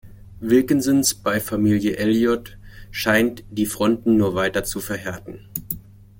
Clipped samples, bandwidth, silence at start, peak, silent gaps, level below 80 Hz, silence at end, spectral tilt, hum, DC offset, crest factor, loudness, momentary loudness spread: under 0.1%; 17 kHz; 0.05 s; -4 dBFS; none; -46 dBFS; 0.4 s; -4.5 dB/octave; none; under 0.1%; 18 dB; -20 LUFS; 14 LU